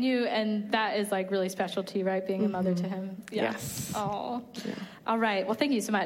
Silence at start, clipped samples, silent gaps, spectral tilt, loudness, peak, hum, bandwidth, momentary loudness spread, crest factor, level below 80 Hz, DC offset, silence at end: 0 s; under 0.1%; none; -5 dB/octave; -30 LUFS; -12 dBFS; none; 16.5 kHz; 9 LU; 18 dB; -70 dBFS; under 0.1%; 0 s